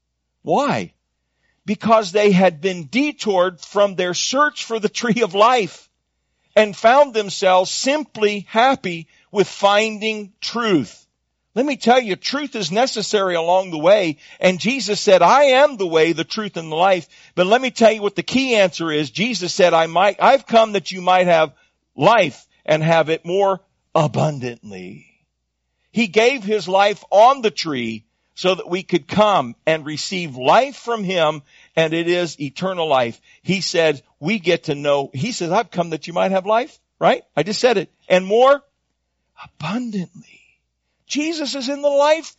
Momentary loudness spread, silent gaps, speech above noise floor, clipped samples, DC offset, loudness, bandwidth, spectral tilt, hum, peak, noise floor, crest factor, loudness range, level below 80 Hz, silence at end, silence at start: 11 LU; none; 56 dB; under 0.1%; under 0.1%; -18 LUFS; 8 kHz; -3 dB/octave; none; -2 dBFS; -73 dBFS; 16 dB; 5 LU; -64 dBFS; 0.1 s; 0.45 s